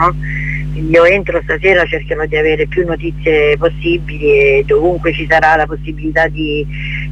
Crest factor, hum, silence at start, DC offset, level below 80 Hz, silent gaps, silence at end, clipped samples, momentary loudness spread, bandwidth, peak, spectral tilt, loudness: 12 dB; none; 0 s; under 0.1%; -26 dBFS; none; 0 s; under 0.1%; 9 LU; 8.8 kHz; 0 dBFS; -7 dB/octave; -13 LUFS